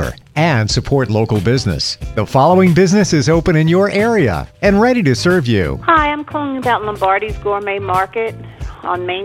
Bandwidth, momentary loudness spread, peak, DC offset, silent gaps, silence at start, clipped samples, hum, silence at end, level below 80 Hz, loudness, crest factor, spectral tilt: 16 kHz; 9 LU; 0 dBFS; under 0.1%; none; 0 s; under 0.1%; none; 0 s; -32 dBFS; -14 LUFS; 14 dB; -6 dB/octave